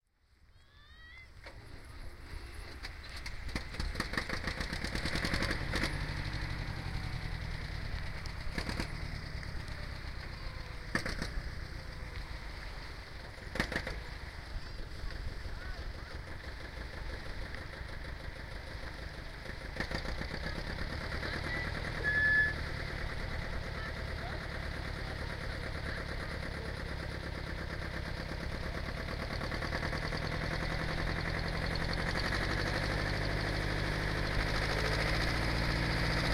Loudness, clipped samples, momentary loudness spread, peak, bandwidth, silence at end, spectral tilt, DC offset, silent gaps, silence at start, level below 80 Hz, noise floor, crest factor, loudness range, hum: -37 LUFS; under 0.1%; 13 LU; -14 dBFS; 16 kHz; 0 s; -5 dB/octave; under 0.1%; none; 0.55 s; -42 dBFS; -66 dBFS; 22 dB; 10 LU; none